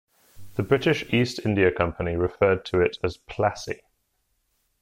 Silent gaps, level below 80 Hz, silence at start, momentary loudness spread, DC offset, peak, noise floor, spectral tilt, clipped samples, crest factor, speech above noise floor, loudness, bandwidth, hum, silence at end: none; -46 dBFS; 0.35 s; 11 LU; under 0.1%; -6 dBFS; -72 dBFS; -6.5 dB/octave; under 0.1%; 20 dB; 49 dB; -24 LUFS; 16 kHz; none; 1.05 s